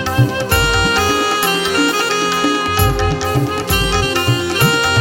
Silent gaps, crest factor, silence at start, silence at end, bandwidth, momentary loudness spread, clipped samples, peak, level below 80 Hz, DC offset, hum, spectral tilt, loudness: none; 14 dB; 0 s; 0 s; 17 kHz; 3 LU; under 0.1%; 0 dBFS; -28 dBFS; under 0.1%; none; -4 dB/octave; -14 LUFS